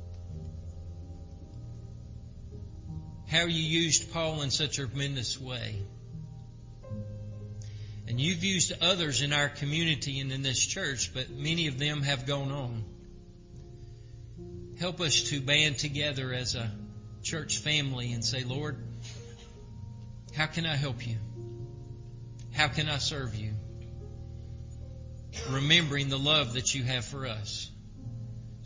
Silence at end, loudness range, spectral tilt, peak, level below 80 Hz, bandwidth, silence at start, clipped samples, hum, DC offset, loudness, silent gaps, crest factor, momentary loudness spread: 0 s; 7 LU; -3 dB/octave; -8 dBFS; -50 dBFS; 7.8 kHz; 0 s; under 0.1%; none; under 0.1%; -29 LUFS; none; 24 dB; 21 LU